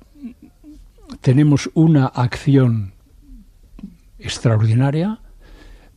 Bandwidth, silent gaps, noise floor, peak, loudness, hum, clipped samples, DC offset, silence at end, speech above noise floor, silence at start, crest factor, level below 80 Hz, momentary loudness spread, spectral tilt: 11 kHz; none; -43 dBFS; -2 dBFS; -17 LUFS; none; under 0.1%; under 0.1%; 0.25 s; 28 dB; 0.2 s; 16 dB; -44 dBFS; 19 LU; -7.5 dB/octave